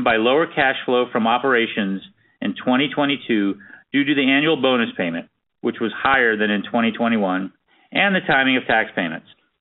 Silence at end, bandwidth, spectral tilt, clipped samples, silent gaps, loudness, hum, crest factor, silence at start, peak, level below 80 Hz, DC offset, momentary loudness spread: 0.4 s; 4.1 kHz; -2.5 dB/octave; under 0.1%; none; -19 LUFS; none; 18 dB; 0 s; -2 dBFS; -58 dBFS; under 0.1%; 11 LU